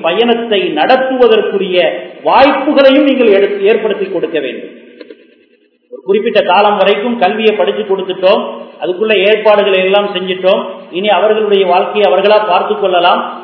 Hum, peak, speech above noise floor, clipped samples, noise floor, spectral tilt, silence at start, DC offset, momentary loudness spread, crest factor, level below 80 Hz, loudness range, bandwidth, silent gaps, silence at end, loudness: none; 0 dBFS; 41 dB; 0.5%; -51 dBFS; -7 dB/octave; 0 s; under 0.1%; 8 LU; 10 dB; -56 dBFS; 4 LU; 5.4 kHz; none; 0 s; -10 LUFS